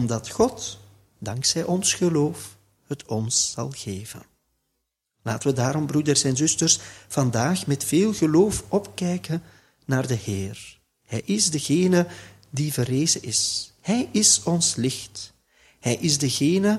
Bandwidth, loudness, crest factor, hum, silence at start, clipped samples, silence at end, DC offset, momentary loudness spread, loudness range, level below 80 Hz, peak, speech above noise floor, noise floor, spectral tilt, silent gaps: 15.5 kHz; -22 LUFS; 20 dB; none; 0 s; under 0.1%; 0 s; under 0.1%; 16 LU; 5 LU; -56 dBFS; -4 dBFS; 55 dB; -78 dBFS; -4 dB/octave; none